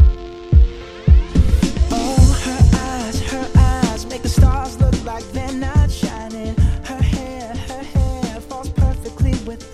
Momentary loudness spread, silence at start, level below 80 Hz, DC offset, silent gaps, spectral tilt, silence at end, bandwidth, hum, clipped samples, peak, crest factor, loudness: 12 LU; 0 s; -18 dBFS; under 0.1%; none; -6.5 dB/octave; 0 s; 13 kHz; none; under 0.1%; 0 dBFS; 14 dB; -18 LUFS